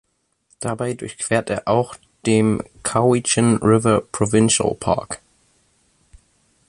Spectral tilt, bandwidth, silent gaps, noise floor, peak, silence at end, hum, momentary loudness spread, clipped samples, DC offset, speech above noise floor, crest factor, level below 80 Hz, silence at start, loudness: -5 dB/octave; 11.5 kHz; none; -62 dBFS; -2 dBFS; 1.5 s; none; 11 LU; under 0.1%; under 0.1%; 43 dB; 18 dB; -48 dBFS; 0.6 s; -19 LUFS